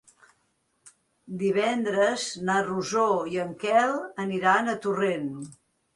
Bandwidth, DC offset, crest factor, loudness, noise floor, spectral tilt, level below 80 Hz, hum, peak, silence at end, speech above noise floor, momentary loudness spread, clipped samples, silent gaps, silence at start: 11.5 kHz; under 0.1%; 18 dB; -26 LUFS; -72 dBFS; -4.5 dB/octave; -70 dBFS; none; -8 dBFS; 0.4 s; 46 dB; 9 LU; under 0.1%; none; 0.85 s